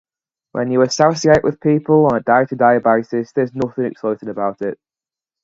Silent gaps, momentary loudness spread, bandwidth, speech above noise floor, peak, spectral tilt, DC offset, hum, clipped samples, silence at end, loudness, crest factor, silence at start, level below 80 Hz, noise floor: none; 10 LU; 7.8 kHz; over 74 dB; 0 dBFS; -6 dB/octave; under 0.1%; none; under 0.1%; 0.7 s; -16 LUFS; 16 dB; 0.55 s; -50 dBFS; under -90 dBFS